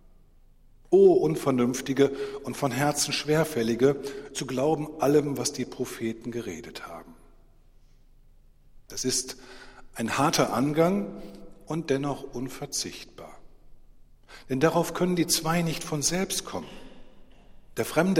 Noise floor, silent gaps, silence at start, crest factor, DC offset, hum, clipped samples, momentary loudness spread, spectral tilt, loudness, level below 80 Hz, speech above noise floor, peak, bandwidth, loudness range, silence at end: -55 dBFS; none; 0.9 s; 20 dB; under 0.1%; none; under 0.1%; 16 LU; -4.5 dB/octave; -26 LUFS; -54 dBFS; 29 dB; -8 dBFS; 16 kHz; 11 LU; 0 s